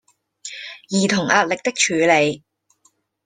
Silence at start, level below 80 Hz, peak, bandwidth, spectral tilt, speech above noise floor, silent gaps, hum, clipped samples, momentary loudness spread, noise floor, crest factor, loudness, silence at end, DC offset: 0.45 s; -64 dBFS; -2 dBFS; 10 kHz; -3.5 dB/octave; 45 dB; none; none; under 0.1%; 19 LU; -62 dBFS; 20 dB; -18 LUFS; 0.9 s; under 0.1%